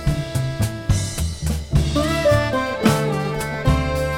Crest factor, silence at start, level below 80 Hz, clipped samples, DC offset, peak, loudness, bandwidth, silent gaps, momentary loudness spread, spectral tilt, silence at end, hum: 18 dB; 0 s; -28 dBFS; under 0.1%; under 0.1%; -2 dBFS; -21 LUFS; 17 kHz; none; 7 LU; -5.5 dB/octave; 0 s; none